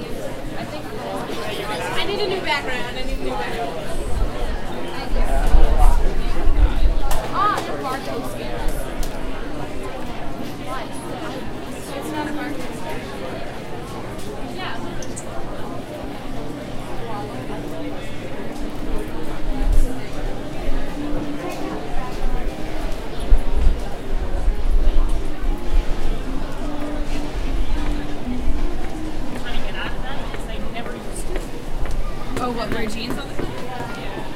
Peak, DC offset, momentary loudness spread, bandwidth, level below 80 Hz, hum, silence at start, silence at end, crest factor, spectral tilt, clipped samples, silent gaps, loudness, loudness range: 0 dBFS; under 0.1%; 9 LU; 13 kHz; -22 dBFS; none; 0 s; 0 s; 18 dB; -5.5 dB/octave; under 0.1%; none; -27 LUFS; 7 LU